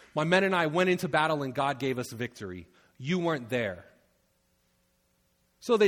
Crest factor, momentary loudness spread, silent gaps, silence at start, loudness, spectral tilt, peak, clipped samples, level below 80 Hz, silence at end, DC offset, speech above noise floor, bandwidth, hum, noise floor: 22 dB; 17 LU; none; 0.15 s; -28 LUFS; -5.5 dB/octave; -8 dBFS; under 0.1%; -68 dBFS; 0 s; under 0.1%; 43 dB; 17.5 kHz; none; -71 dBFS